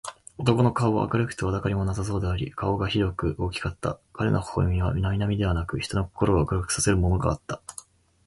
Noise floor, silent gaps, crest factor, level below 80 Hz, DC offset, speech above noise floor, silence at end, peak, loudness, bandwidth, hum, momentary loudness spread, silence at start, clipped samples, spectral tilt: -48 dBFS; none; 18 dB; -36 dBFS; under 0.1%; 23 dB; 0.55 s; -6 dBFS; -26 LUFS; 11.5 kHz; none; 9 LU; 0.05 s; under 0.1%; -6 dB/octave